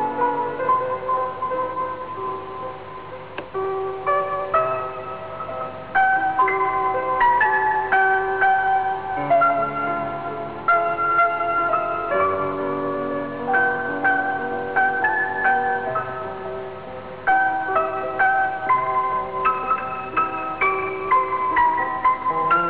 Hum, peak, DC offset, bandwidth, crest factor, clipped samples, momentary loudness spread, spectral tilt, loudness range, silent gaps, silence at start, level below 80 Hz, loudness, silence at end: 50 Hz at -55 dBFS; -10 dBFS; 0.5%; 4 kHz; 12 dB; under 0.1%; 12 LU; -8.5 dB/octave; 7 LU; none; 0 s; -54 dBFS; -21 LUFS; 0 s